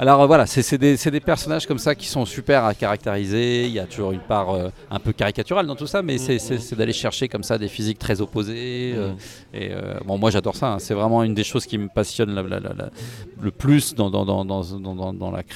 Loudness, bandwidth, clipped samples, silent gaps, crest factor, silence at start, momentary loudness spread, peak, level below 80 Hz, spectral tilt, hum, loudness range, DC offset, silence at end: -22 LUFS; 16 kHz; under 0.1%; none; 20 dB; 0 s; 12 LU; 0 dBFS; -46 dBFS; -5.5 dB/octave; none; 4 LU; under 0.1%; 0 s